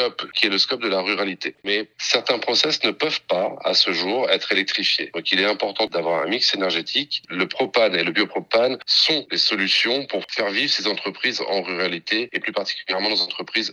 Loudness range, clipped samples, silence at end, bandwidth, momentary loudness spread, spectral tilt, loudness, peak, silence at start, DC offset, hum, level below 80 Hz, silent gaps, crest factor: 2 LU; under 0.1%; 0 s; 11.5 kHz; 6 LU; -2.5 dB/octave; -20 LUFS; -2 dBFS; 0 s; under 0.1%; none; -76 dBFS; none; 20 dB